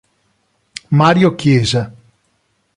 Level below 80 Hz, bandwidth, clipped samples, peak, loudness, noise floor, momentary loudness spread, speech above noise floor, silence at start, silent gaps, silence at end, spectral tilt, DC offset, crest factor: -46 dBFS; 11 kHz; under 0.1%; 0 dBFS; -13 LUFS; -63 dBFS; 21 LU; 51 dB; 0.9 s; none; 0.85 s; -6 dB/octave; under 0.1%; 16 dB